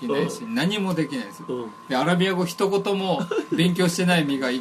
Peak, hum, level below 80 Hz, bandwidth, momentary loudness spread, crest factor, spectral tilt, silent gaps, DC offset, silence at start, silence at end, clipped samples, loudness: -6 dBFS; none; -66 dBFS; 13.5 kHz; 11 LU; 18 dB; -5.5 dB/octave; none; under 0.1%; 0 s; 0 s; under 0.1%; -23 LUFS